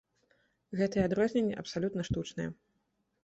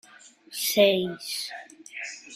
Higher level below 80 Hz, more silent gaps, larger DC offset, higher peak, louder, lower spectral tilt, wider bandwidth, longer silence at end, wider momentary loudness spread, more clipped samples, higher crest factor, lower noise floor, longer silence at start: first, -56 dBFS vs -72 dBFS; neither; neither; second, -16 dBFS vs -6 dBFS; second, -33 LUFS vs -25 LUFS; first, -6.5 dB/octave vs -3 dB/octave; second, 8.2 kHz vs 16 kHz; first, 0.7 s vs 0 s; second, 11 LU vs 19 LU; neither; about the same, 18 dB vs 22 dB; first, -78 dBFS vs -52 dBFS; first, 0.7 s vs 0.25 s